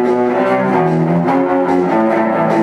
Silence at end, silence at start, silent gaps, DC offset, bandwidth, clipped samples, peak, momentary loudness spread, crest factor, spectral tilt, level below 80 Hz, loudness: 0 s; 0 s; none; under 0.1%; 11.5 kHz; under 0.1%; 0 dBFS; 1 LU; 12 dB; -8.5 dB/octave; -54 dBFS; -14 LUFS